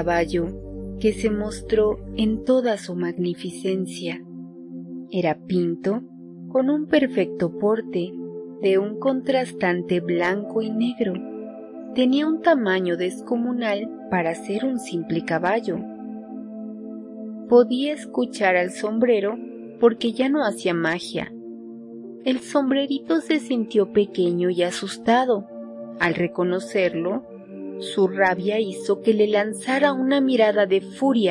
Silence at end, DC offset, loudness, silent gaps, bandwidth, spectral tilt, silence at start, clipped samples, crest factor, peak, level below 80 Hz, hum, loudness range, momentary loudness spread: 0 s; under 0.1%; -22 LUFS; none; 11.5 kHz; -6 dB/octave; 0 s; under 0.1%; 18 dB; -4 dBFS; -50 dBFS; none; 4 LU; 16 LU